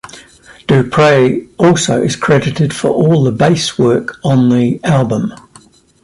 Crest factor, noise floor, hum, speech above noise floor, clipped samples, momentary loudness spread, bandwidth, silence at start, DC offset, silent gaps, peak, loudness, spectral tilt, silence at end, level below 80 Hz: 12 dB; -44 dBFS; none; 33 dB; under 0.1%; 6 LU; 11.5 kHz; 0.05 s; under 0.1%; none; 0 dBFS; -12 LUFS; -6 dB/octave; 0.65 s; -46 dBFS